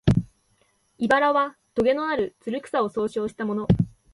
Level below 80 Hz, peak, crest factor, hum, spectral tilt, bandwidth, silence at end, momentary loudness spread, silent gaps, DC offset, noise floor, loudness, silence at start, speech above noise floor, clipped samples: -44 dBFS; -2 dBFS; 22 dB; none; -7.5 dB/octave; 11.5 kHz; 0.25 s; 9 LU; none; under 0.1%; -66 dBFS; -24 LUFS; 0.05 s; 43 dB; under 0.1%